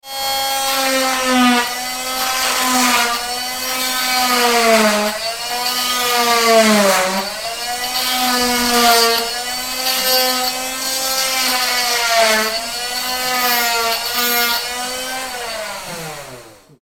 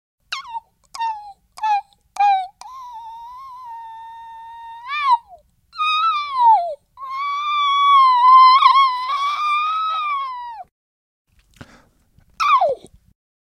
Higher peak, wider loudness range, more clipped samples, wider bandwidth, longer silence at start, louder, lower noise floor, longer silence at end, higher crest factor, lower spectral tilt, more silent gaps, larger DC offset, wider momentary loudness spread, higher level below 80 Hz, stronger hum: about the same, 0 dBFS vs 0 dBFS; second, 3 LU vs 11 LU; neither; first, 19 kHz vs 10 kHz; second, 0.05 s vs 0.3 s; about the same, -15 LUFS vs -16 LUFS; second, -39 dBFS vs -56 dBFS; second, 0.3 s vs 0.7 s; about the same, 16 dB vs 18 dB; about the same, -1 dB/octave vs -0.5 dB/octave; second, none vs 10.71-11.25 s; neither; second, 10 LU vs 25 LU; first, -48 dBFS vs -62 dBFS; neither